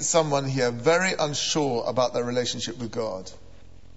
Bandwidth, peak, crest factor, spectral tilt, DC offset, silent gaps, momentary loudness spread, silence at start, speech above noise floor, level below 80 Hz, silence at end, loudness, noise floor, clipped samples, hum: 8.2 kHz; -8 dBFS; 18 dB; -3.5 dB/octave; 0.7%; none; 9 LU; 0 s; 25 dB; -56 dBFS; 0.6 s; -25 LUFS; -50 dBFS; under 0.1%; none